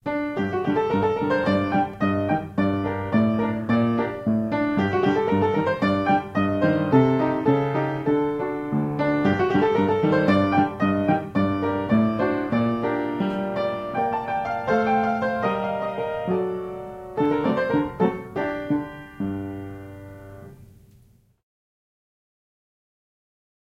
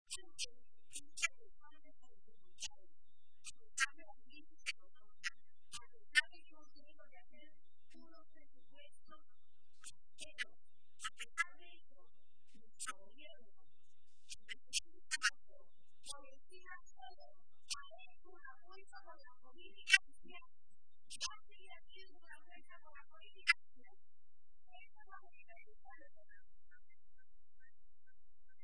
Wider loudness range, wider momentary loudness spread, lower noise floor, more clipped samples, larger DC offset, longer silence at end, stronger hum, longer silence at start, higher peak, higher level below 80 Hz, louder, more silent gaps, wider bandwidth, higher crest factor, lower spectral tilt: second, 6 LU vs 15 LU; second, 8 LU vs 27 LU; second, -56 dBFS vs -76 dBFS; neither; second, under 0.1% vs 0.6%; first, 3.05 s vs 2.25 s; neither; about the same, 0.05 s vs 0.05 s; first, -4 dBFS vs -12 dBFS; first, -54 dBFS vs -76 dBFS; first, -23 LUFS vs -41 LUFS; neither; second, 7.6 kHz vs 10.5 kHz; second, 20 dB vs 36 dB; first, -8.5 dB/octave vs 1 dB/octave